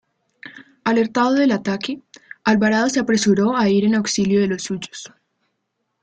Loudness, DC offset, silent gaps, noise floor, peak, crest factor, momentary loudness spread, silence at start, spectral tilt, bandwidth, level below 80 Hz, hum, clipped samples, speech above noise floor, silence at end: -18 LUFS; under 0.1%; none; -74 dBFS; -4 dBFS; 16 dB; 17 LU; 0.45 s; -5 dB/octave; 9.2 kHz; -58 dBFS; none; under 0.1%; 56 dB; 0.95 s